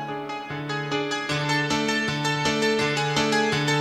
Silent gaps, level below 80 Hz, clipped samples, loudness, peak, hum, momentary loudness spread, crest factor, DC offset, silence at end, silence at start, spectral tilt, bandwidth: none; -56 dBFS; under 0.1%; -24 LUFS; -10 dBFS; none; 9 LU; 14 dB; under 0.1%; 0 s; 0 s; -4 dB/octave; 15 kHz